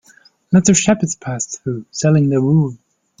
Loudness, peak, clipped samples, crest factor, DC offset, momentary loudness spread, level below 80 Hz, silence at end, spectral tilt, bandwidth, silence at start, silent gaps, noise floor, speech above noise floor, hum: -16 LUFS; 0 dBFS; under 0.1%; 16 dB; under 0.1%; 11 LU; -50 dBFS; 0.45 s; -5.5 dB/octave; 9.6 kHz; 0.5 s; none; -50 dBFS; 35 dB; none